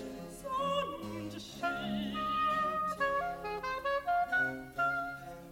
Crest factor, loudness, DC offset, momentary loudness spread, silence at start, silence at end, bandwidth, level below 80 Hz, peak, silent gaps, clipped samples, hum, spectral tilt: 14 dB; -34 LUFS; under 0.1%; 11 LU; 0 s; 0 s; 16.5 kHz; -60 dBFS; -20 dBFS; none; under 0.1%; none; -4.5 dB/octave